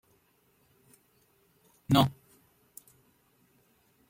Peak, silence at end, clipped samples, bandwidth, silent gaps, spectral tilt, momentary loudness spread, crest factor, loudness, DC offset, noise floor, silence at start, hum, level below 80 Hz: -10 dBFS; 2 s; under 0.1%; 16.5 kHz; none; -6 dB/octave; 27 LU; 24 dB; -27 LUFS; under 0.1%; -69 dBFS; 1.9 s; none; -64 dBFS